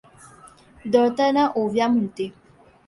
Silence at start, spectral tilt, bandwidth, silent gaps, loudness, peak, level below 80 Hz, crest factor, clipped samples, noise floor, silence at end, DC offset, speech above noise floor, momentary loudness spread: 0.85 s; -6 dB/octave; 11.5 kHz; none; -21 LUFS; -4 dBFS; -60 dBFS; 18 dB; under 0.1%; -49 dBFS; 0.6 s; under 0.1%; 29 dB; 13 LU